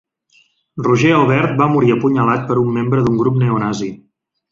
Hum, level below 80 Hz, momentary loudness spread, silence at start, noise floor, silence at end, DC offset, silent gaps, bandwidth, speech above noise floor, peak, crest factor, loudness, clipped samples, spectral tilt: none; -50 dBFS; 9 LU; 0.75 s; -56 dBFS; 0.55 s; under 0.1%; none; 7.6 kHz; 42 dB; -2 dBFS; 14 dB; -15 LUFS; under 0.1%; -7.5 dB/octave